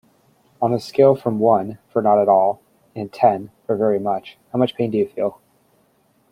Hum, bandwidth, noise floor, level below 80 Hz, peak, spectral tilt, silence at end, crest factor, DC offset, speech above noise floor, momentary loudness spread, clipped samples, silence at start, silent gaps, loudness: none; 14.5 kHz; -61 dBFS; -64 dBFS; -2 dBFS; -8 dB/octave; 1 s; 18 dB; under 0.1%; 42 dB; 12 LU; under 0.1%; 0.6 s; none; -19 LUFS